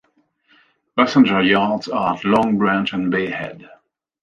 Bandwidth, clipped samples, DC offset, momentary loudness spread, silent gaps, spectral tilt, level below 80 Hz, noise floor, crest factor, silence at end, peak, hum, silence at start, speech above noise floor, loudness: 7.2 kHz; under 0.1%; under 0.1%; 11 LU; none; -6.5 dB/octave; -56 dBFS; -61 dBFS; 18 dB; 0.6 s; -2 dBFS; none; 0.95 s; 44 dB; -18 LUFS